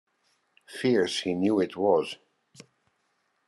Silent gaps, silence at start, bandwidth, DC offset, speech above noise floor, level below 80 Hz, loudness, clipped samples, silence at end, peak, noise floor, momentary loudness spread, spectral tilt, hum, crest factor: none; 0.7 s; 12.5 kHz; under 0.1%; 48 dB; -76 dBFS; -26 LUFS; under 0.1%; 1.35 s; -10 dBFS; -74 dBFS; 15 LU; -5 dB/octave; none; 20 dB